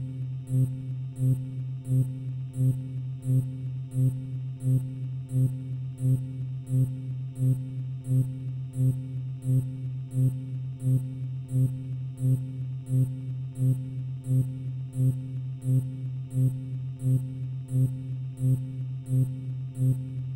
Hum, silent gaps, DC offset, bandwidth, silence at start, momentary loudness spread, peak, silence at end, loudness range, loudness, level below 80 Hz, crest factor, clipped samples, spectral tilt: none; none; under 0.1%; 12.5 kHz; 0 s; 7 LU; -16 dBFS; 0 s; 1 LU; -29 LUFS; -58 dBFS; 12 dB; under 0.1%; -9.5 dB/octave